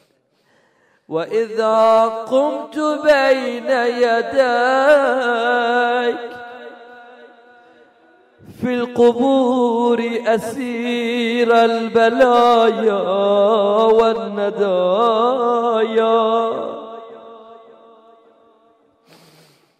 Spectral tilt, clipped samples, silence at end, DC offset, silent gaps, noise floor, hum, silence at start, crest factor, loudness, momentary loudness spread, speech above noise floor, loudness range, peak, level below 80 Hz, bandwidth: -5 dB/octave; under 0.1%; 2.25 s; under 0.1%; none; -61 dBFS; none; 1.1 s; 14 dB; -16 LUFS; 11 LU; 45 dB; 8 LU; -4 dBFS; -60 dBFS; 12.5 kHz